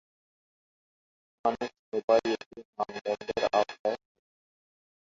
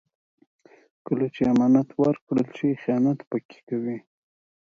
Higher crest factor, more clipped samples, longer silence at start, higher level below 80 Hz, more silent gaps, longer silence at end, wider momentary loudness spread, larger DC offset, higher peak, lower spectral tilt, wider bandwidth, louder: about the same, 22 dB vs 18 dB; neither; first, 1.45 s vs 1.1 s; second, -70 dBFS vs -62 dBFS; first, 1.79-1.92 s, 2.04-2.08 s, 2.46-2.51 s, 2.65-2.73 s, 3.01-3.05 s, 3.79-3.84 s vs 2.21-2.27 s, 3.27-3.31 s, 3.45-3.49 s, 3.63-3.67 s; first, 1.1 s vs 0.65 s; about the same, 11 LU vs 12 LU; neither; about the same, -10 dBFS vs -8 dBFS; second, -4 dB/octave vs -9 dB/octave; about the same, 7.4 kHz vs 7.2 kHz; second, -30 LUFS vs -24 LUFS